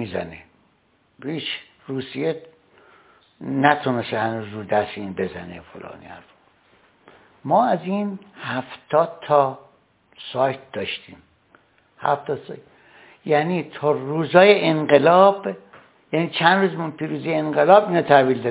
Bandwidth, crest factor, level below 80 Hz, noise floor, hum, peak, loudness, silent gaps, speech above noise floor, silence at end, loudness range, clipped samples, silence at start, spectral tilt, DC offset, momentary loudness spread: 4 kHz; 22 dB; -62 dBFS; -62 dBFS; none; 0 dBFS; -20 LUFS; none; 42 dB; 0 s; 11 LU; under 0.1%; 0 s; -10 dB/octave; under 0.1%; 22 LU